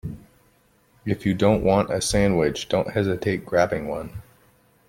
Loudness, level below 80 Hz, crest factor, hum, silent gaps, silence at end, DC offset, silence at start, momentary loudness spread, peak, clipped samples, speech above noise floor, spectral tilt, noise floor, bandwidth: -22 LUFS; -44 dBFS; 20 dB; none; none; 0.7 s; under 0.1%; 0.05 s; 16 LU; -4 dBFS; under 0.1%; 39 dB; -5.5 dB/octave; -60 dBFS; 16.5 kHz